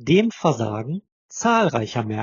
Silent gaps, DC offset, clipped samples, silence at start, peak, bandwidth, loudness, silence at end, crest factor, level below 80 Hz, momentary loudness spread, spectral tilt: 1.12-1.29 s; under 0.1%; under 0.1%; 0 s; -4 dBFS; 7.4 kHz; -21 LUFS; 0 s; 16 dB; -60 dBFS; 13 LU; -5.5 dB/octave